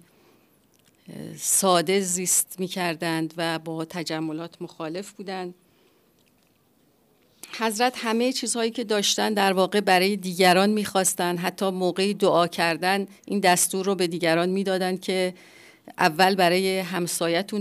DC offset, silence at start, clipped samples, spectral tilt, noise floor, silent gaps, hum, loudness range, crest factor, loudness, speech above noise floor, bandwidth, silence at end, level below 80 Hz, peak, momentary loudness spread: under 0.1%; 1.1 s; under 0.1%; -3 dB/octave; -63 dBFS; none; none; 11 LU; 18 dB; -23 LUFS; 40 dB; 15.5 kHz; 0 s; -74 dBFS; -6 dBFS; 14 LU